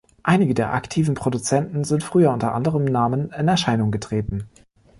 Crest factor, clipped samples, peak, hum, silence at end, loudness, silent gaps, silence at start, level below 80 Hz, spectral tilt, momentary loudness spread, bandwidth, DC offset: 16 dB; under 0.1%; -4 dBFS; none; 0.5 s; -21 LUFS; none; 0.25 s; -46 dBFS; -6 dB/octave; 7 LU; 11.5 kHz; under 0.1%